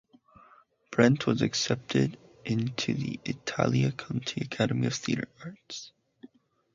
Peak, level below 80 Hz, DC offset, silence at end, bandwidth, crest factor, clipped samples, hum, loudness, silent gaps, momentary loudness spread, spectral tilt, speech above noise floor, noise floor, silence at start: -6 dBFS; -62 dBFS; under 0.1%; 0.5 s; 7.6 kHz; 24 dB; under 0.1%; none; -29 LUFS; none; 17 LU; -5.5 dB/octave; 31 dB; -60 dBFS; 0.9 s